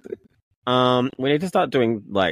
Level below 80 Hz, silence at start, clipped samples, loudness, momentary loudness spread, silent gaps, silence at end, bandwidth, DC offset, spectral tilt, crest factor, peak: -62 dBFS; 0.05 s; under 0.1%; -21 LUFS; 15 LU; 0.43-0.62 s; 0 s; 14.5 kHz; under 0.1%; -6.5 dB/octave; 16 dB; -6 dBFS